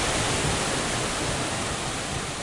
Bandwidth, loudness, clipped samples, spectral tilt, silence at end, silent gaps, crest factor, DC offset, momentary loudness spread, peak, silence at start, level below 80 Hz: 11.5 kHz; -26 LUFS; under 0.1%; -3 dB/octave; 0 s; none; 14 dB; under 0.1%; 5 LU; -12 dBFS; 0 s; -40 dBFS